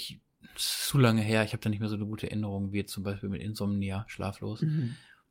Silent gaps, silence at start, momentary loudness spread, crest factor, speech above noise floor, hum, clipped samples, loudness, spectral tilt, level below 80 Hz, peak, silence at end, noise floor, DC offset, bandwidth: none; 0 s; 12 LU; 18 dB; 20 dB; none; under 0.1%; -31 LUFS; -5.5 dB/octave; -60 dBFS; -12 dBFS; 0.3 s; -50 dBFS; under 0.1%; 17 kHz